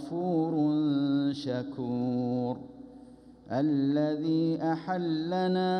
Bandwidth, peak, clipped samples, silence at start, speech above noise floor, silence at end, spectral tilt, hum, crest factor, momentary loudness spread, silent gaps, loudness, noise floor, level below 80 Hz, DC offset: 6.4 kHz; -18 dBFS; under 0.1%; 0 s; 23 dB; 0 s; -8.5 dB/octave; none; 12 dB; 8 LU; none; -29 LUFS; -52 dBFS; -68 dBFS; under 0.1%